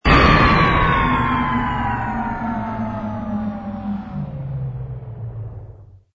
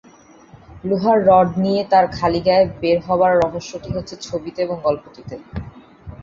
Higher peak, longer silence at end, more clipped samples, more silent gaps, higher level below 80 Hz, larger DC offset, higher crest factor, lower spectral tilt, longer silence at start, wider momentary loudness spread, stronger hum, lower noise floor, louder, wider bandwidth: about the same, -2 dBFS vs -2 dBFS; first, 0.2 s vs 0.05 s; neither; neither; first, -28 dBFS vs -44 dBFS; neither; about the same, 18 dB vs 16 dB; about the same, -7 dB/octave vs -6.5 dB/octave; second, 0.05 s vs 0.7 s; about the same, 18 LU vs 17 LU; neither; second, -41 dBFS vs -46 dBFS; about the same, -19 LUFS vs -18 LUFS; about the same, 7.6 kHz vs 7.4 kHz